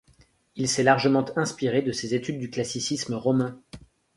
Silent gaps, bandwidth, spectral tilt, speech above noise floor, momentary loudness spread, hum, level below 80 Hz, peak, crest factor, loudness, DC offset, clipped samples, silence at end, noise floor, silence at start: none; 11.5 kHz; -4.5 dB/octave; 35 dB; 10 LU; none; -60 dBFS; -4 dBFS; 22 dB; -25 LUFS; under 0.1%; under 0.1%; 0.4 s; -60 dBFS; 0.55 s